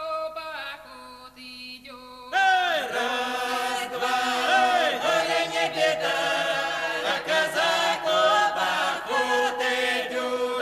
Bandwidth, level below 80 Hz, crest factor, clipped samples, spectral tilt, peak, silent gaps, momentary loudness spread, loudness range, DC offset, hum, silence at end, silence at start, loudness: 14 kHz; -64 dBFS; 14 dB; under 0.1%; -1.5 dB/octave; -10 dBFS; none; 18 LU; 4 LU; under 0.1%; 50 Hz at -65 dBFS; 0 s; 0 s; -24 LUFS